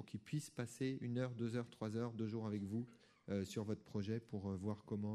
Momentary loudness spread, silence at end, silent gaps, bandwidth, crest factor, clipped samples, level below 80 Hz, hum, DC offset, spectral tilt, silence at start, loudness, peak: 4 LU; 0 s; none; 13 kHz; 14 dB; under 0.1%; -78 dBFS; none; under 0.1%; -7 dB/octave; 0 s; -45 LUFS; -30 dBFS